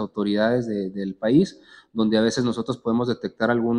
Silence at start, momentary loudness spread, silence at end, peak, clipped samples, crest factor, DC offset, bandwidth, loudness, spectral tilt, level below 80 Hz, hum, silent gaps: 0 s; 8 LU; 0 s; -6 dBFS; under 0.1%; 16 dB; under 0.1%; 10.5 kHz; -23 LUFS; -6 dB/octave; -58 dBFS; none; none